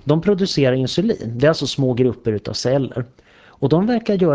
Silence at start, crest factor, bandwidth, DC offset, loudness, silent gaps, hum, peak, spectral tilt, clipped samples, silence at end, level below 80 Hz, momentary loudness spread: 0.05 s; 14 dB; 8 kHz; under 0.1%; -19 LUFS; none; none; -4 dBFS; -6.5 dB/octave; under 0.1%; 0 s; -48 dBFS; 7 LU